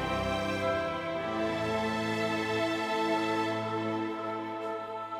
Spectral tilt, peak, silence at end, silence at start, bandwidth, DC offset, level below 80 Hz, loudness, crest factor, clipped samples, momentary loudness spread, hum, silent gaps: -5.5 dB/octave; -18 dBFS; 0 s; 0 s; 15.5 kHz; under 0.1%; -56 dBFS; -31 LUFS; 14 dB; under 0.1%; 6 LU; none; none